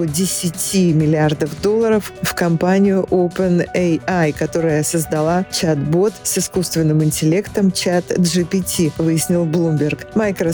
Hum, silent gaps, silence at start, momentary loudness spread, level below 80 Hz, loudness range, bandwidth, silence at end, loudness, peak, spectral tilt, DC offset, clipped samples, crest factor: none; none; 0 s; 4 LU; -46 dBFS; 1 LU; over 20 kHz; 0 s; -17 LUFS; -6 dBFS; -5.5 dB/octave; under 0.1%; under 0.1%; 10 dB